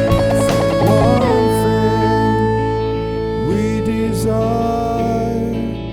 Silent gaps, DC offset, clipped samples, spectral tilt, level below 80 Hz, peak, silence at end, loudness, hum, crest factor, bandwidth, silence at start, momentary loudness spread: none; under 0.1%; under 0.1%; -7 dB/octave; -30 dBFS; 0 dBFS; 0 s; -16 LUFS; none; 14 dB; 17 kHz; 0 s; 7 LU